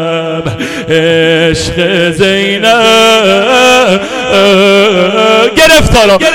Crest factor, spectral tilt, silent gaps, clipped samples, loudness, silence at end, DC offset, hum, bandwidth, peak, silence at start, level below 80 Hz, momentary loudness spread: 6 dB; -4 dB/octave; none; 0.3%; -6 LUFS; 0 s; under 0.1%; none; 17 kHz; 0 dBFS; 0 s; -26 dBFS; 8 LU